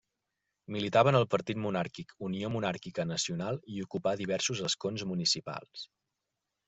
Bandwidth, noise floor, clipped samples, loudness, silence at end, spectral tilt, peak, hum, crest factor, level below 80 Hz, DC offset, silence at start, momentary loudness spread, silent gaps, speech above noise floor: 8.2 kHz; -86 dBFS; under 0.1%; -32 LUFS; 0.8 s; -4.5 dB/octave; -12 dBFS; none; 22 dB; -68 dBFS; under 0.1%; 0.7 s; 15 LU; none; 54 dB